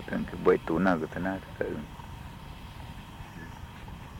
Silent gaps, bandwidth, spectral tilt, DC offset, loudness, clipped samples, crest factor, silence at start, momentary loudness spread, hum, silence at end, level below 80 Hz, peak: none; 17 kHz; -7.5 dB/octave; under 0.1%; -29 LUFS; under 0.1%; 24 dB; 0 s; 18 LU; none; 0 s; -48 dBFS; -8 dBFS